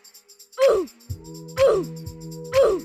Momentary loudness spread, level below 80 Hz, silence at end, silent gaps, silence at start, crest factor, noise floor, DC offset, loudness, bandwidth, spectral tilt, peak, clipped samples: 17 LU; -48 dBFS; 0 s; none; 0.55 s; 16 dB; -50 dBFS; under 0.1%; -21 LUFS; 14.5 kHz; -5 dB/octave; -8 dBFS; under 0.1%